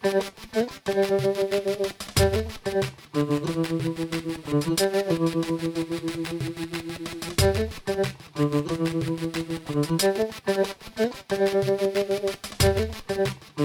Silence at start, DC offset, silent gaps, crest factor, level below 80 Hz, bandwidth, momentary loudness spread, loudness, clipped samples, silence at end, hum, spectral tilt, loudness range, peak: 0 s; under 0.1%; none; 18 dB; -44 dBFS; 18.5 kHz; 7 LU; -26 LUFS; under 0.1%; 0 s; none; -5 dB/octave; 2 LU; -8 dBFS